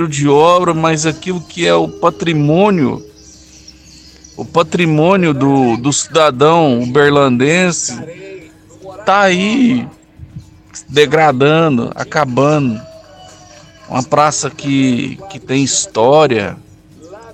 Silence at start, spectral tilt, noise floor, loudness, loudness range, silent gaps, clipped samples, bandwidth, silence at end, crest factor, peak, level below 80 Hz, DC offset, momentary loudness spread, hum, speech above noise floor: 0 s; -5 dB/octave; -40 dBFS; -12 LUFS; 4 LU; none; under 0.1%; 11 kHz; 0 s; 14 dB; 0 dBFS; -48 dBFS; under 0.1%; 12 LU; none; 28 dB